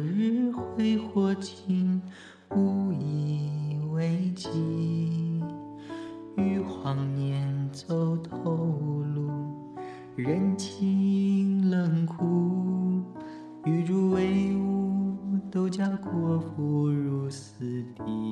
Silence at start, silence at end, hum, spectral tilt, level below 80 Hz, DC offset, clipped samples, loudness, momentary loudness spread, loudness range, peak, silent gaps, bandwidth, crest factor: 0 s; 0 s; none; -8 dB/octave; -66 dBFS; under 0.1%; under 0.1%; -28 LUFS; 11 LU; 4 LU; -14 dBFS; none; 9.4 kHz; 14 dB